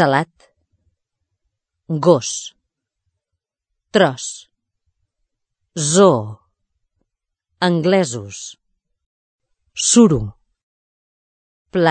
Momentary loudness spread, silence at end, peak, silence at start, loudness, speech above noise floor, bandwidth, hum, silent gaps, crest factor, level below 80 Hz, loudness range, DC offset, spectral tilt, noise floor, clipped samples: 20 LU; 0 s; 0 dBFS; 0 s; -16 LUFS; 65 dB; 9.2 kHz; none; 9.06-9.39 s, 10.63-11.65 s; 20 dB; -50 dBFS; 5 LU; under 0.1%; -4.5 dB/octave; -81 dBFS; under 0.1%